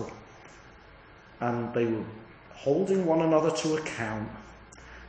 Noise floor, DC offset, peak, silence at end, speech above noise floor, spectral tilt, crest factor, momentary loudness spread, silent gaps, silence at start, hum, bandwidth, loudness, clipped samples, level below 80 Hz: -52 dBFS; under 0.1%; -10 dBFS; 0 s; 25 dB; -6 dB/octave; 20 dB; 25 LU; none; 0 s; none; 9.2 kHz; -28 LUFS; under 0.1%; -58 dBFS